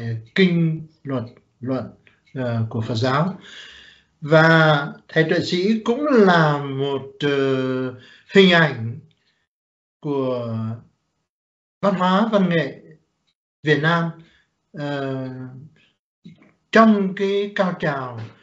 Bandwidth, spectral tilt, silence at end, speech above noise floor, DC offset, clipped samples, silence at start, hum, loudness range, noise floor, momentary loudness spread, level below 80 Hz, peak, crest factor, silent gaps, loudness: 8 kHz; -7 dB/octave; 0.15 s; 50 dB; under 0.1%; under 0.1%; 0 s; none; 8 LU; -70 dBFS; 18 LU; -64 dBFS; 0 dBFS; 20 dB; 9.47-10.00 s, 11.29-11.81 s, 13.35-13.63 s, 15.99-16.22 s; -19 LUFS